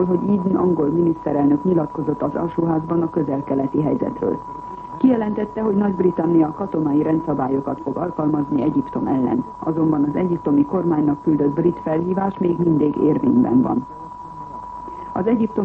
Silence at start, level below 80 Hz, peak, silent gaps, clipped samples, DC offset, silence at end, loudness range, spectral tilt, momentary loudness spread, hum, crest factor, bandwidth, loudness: 0 s; -50 dBFS; -4 dBFS; none; under 0.1%; under 0.1%; 0 s; 2 LU; -11 dB/octave; 8 LU; none; 14 dB; 3.9 kHz; -20 LUFS